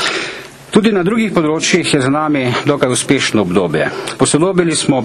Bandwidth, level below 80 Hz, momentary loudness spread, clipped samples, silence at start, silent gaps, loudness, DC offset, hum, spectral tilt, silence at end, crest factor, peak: 13.5 kHz; -46 dBFS; 5 LU; under 0.1%; 0 s; none; -14 LUFS; under 0.1%; none; -4.5 dB/octave; 0 s; 14 dB; 0 dBFS